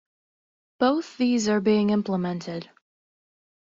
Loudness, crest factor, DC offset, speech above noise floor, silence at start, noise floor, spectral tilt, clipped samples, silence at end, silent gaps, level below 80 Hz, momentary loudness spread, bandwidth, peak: -24 LUFS; 16 dB; under 0.1%; over 67 dB; 0.8 s; under -90 dBFS; -5.5 dB/octave; under 0.1%; 1.05 s; none; -66 dBFS; 11 LU; 7.6 kHz; -10 dBFS